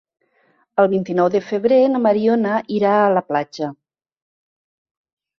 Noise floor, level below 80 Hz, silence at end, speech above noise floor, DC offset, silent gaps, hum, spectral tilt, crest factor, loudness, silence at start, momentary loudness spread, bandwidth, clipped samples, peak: -61 dBFS; -64 dBFS; 1.65 s; 44 dB; under 0.1%; none; none; -7.5 dB/octave; 16 dB; -18 LUFS; 0.75 s; 10 LU; 6.6 kHz; under 0.1%; -2 dBFS